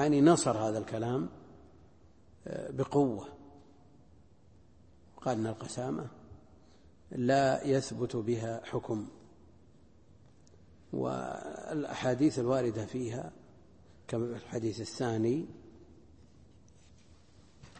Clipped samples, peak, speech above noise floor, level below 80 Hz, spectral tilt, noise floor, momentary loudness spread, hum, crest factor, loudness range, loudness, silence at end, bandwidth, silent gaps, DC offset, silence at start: under 0.1%; -12 dBFS; 30 dB; -64 dBFS; -6 dB/octave; -62 dBFS; 17 LU; none; 22 dB; 7 LU; -33 LUFS; 0 s; 8.8 kHz; none; under 0.1%; 0 s